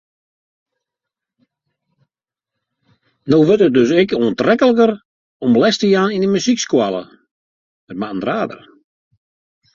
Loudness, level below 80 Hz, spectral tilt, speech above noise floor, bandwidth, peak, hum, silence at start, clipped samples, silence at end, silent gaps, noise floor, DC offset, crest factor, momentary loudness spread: -15 LUFS; -58 dBFS; -5.5 dB/octave; 71 dB; 7.6 kHz; -2 dBFS; none; 3.25 s; under 0.1%; 1.2 s; 5.05-5.40 s, 7.31-7.87 s; -85 dBFS; under 0.1%; 16 dB; 14 LU